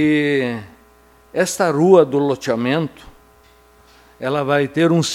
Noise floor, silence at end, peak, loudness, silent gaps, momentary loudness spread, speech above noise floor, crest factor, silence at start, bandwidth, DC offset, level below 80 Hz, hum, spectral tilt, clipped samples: -50 dBFS; 0 s; 0 dBFS; -17 LUFS; none; 14 LU; 34 dB; 18 dB; 0 s; 15.5 kHz; under 0.1%; -54 dBFS; 60 Hz at -50 dBFS; -5.5 dB/octave; under 0.1%